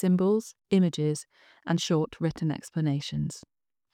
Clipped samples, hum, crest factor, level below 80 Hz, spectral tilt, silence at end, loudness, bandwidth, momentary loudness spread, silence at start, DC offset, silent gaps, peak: under 0.1%; none; 16 dB; -62 dBFS; -6.5 dB/octave; 0.55 s; -28 LUFS; 14 kHz; 11 LU; 0 s; under 0.1%; none; -12 dBFS